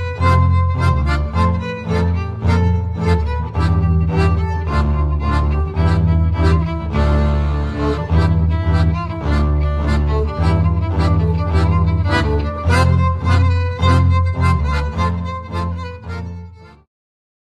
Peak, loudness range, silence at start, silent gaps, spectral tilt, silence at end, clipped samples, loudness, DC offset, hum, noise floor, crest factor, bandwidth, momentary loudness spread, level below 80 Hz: -2 dBFS; 2 LU; 0 s; none; -8 dB/octave; 0.9 s; under 0.1%; -17 LUFS; under 0.1%; none; -36 dBFS; 14 dB; 9.4 kHz; 6 LU; -22 dBFS